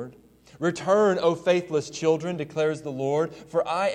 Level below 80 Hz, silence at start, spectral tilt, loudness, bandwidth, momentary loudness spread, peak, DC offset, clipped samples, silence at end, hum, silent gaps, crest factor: -64 dBFS; 0 s; -5.5 dB/octave; -25 LUFS; 10.5 kHz; 8 LU; -8 dBFS; under 0.1%; under 0.1%; 0 s; none; none; 18 dB